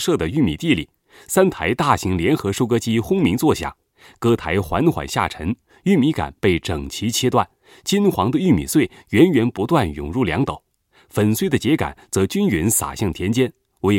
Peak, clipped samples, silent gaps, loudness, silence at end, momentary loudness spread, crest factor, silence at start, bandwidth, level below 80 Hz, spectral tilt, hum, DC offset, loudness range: 0 dBFS; under 0.1%; none; -19 LUFS; 0 s; 7 LU; 18 dB; 0 s; 17 kHz; -44 dBFS; -5.5 dB/octave; none; under 0.1%; 2 LU